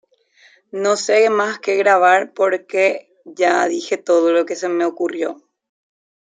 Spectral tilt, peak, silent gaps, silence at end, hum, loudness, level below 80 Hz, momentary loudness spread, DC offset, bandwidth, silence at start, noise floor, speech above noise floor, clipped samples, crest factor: -3 dB/octave; -2 dBFS; none; 1 s; none; -17 LUFS; -76 dBFS; 9 LU; under 0.1%; 9.4 kHz; 0.75 s; -53 dBFS; 37 dB; under 0.1%; 16 dB